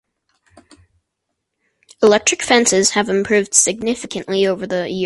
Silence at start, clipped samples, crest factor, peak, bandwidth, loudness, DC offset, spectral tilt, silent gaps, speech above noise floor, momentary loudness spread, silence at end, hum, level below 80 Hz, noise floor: 2 s; under 0.1%; 18 dB; 0 dBFS; 13 kHz; -15 LUFS; under 0.1%; -2.5 dB/octave; none; 60 dB; 9 LU; 0 s; none; -56 dBFS; -76 dBFS